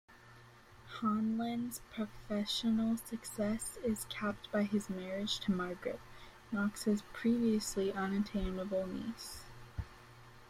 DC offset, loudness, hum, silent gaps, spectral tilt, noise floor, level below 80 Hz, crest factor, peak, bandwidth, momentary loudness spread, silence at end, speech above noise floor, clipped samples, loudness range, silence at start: under 0.1%; -37 LUFS; none; none; -5 dB/octave; -58 dBFS; -56 dBFS; 16 dB; -22 dBFS; 15.5 kHz; 14 LU; 0 s; 22 dB; under 0.1%; 2 LU; 0.1 s